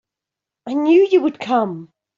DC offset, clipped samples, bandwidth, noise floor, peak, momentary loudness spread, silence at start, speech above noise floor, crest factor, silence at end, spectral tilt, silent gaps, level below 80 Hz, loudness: under 0.1%; under 0.1%; 7.2 kHz; -86 dBFS; -4 dBFS; 18 LU; 0.65 s; 70 dB; 14 dB; 0.35 s; -7 dB/octave; none; -68 dBFS; -17 LUFS